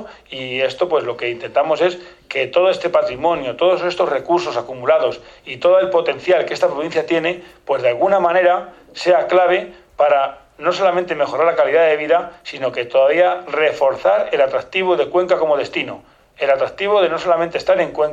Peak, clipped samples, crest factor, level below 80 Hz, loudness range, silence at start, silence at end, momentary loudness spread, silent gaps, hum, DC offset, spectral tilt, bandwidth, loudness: -2 dBFS; under 0.1%; 14 dB; -56 dBFS; 2 LU; 0 s; 0 s; 9 LU; none; none; under 0.1%; -5 dB/octave; 7.8 kHz; -17 LUFS